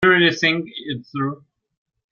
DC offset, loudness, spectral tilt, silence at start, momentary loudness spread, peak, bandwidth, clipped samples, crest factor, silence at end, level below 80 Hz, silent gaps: under 0.1%; -20 LUFS; -5 dB/octave; 0 s; 15 LU; -2 dBFS; 7 kHz; under 0.1%; 18 dB; 0.75 s; -58 dBFS; none